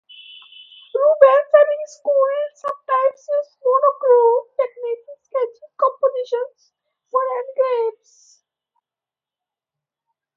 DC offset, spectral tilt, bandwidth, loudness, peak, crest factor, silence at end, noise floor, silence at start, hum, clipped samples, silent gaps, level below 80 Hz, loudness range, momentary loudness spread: under 0.1%; -1.5 dB/octave; 7.4 kHz; -18 LUFS; 0 dBFS; 20 dB; 2.45 s; -89 dBFS; 0.95 s; none; under 0.1%; none; -80 dBFS; 9 LU; 14 LU